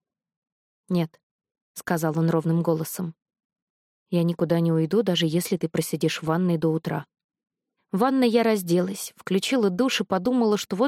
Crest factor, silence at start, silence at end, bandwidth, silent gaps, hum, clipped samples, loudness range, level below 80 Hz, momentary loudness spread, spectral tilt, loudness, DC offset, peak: 16 dB; 0.9 s; 0 s; 16 kHz; 1.23-1.39 s, 1.62-1.75 s, 3.45-3.50 s, 3.62-4.06 s, 7.24-7.29 s; none; under 0.1%; 4 LU; -68 dBFS; 10 LU; -6 dB/octave; -24 LUFS; under 0.1%; -8 dBFS